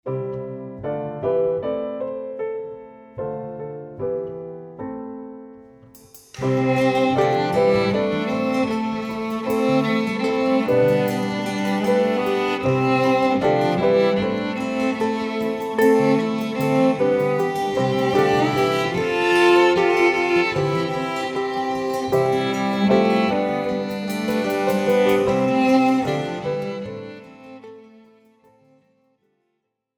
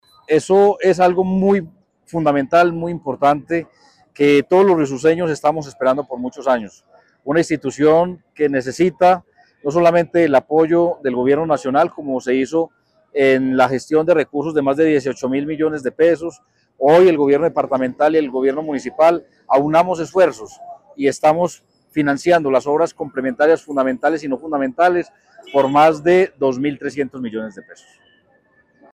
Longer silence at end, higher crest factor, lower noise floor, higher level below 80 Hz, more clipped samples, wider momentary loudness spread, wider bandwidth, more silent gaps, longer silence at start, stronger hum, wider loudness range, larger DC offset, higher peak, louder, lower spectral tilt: first, 2.15 s vs 1.2 s; about the same, 16 dB vs 14 dB; first, -75 dBFS vs -57 dBFS; about the same, -56 dBFS vs -58 dBFS; neither; first, 15 LU vs 10 LU; first, over 20 kHz vs 12.5 kHz; neither; second, 0.05 s vs 0.3 s; neither; first, 11 LU vs 2 LU; neither; about the same, -4 dBFS vs -4 dBFS; second, -20 LUFS vs -17 LUFS; about the same, -6 dB/octave vs -6.5 dB/octave